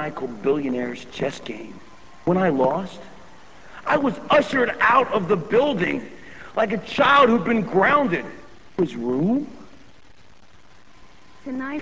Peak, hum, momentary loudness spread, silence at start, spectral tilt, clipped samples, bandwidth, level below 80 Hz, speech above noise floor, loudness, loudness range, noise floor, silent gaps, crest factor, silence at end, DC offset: -4 dBFS; none; 18 LU; 0 s; -6.5 dB/octave; under 0.1%; 8 kHz; -54 dBFS; 32 dB; -21 LUFS; 7 LU; -53 dBFS; none; 18 dB; 0 s; 0.7%